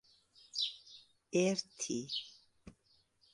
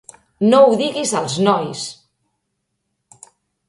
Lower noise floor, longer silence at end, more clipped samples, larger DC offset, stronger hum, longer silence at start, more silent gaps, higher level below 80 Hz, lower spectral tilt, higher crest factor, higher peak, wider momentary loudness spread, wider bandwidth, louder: about the same, -73 dBFS vs -74 dBFS; second, 0.65 s vs 1.75 s; neither; neither; neither; first, 0.55 s vs 0.4 s; neither; second, -76 dBFS vs -62 dBFS; about the same, -3.5 dB/octave vs -4.5 dB/octave; about the same, 22 dB vs 18 dB; second, -18 dBFS vs 0 dBFS; first, 23 LU vs 15 LU; about the same, 11.5 kHz vs 11.5 kHz; second, -37 LUFS vs -16 LUFS